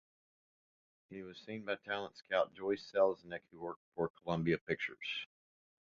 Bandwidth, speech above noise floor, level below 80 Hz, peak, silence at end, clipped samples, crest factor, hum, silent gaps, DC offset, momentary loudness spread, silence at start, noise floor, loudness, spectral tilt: 7.2 kHz; over 52 dB; -72 dBFS; -18 dBFS; 0.7 s; under 0.1%; 22 dB; none; 3.76-3.92 s, 4.10-4.14 s, 4.61-4.67 s; under 0.1%; 15 LU; 1.1 s; under -90 dBFS; -38 LUFS; -3.5 dB/octave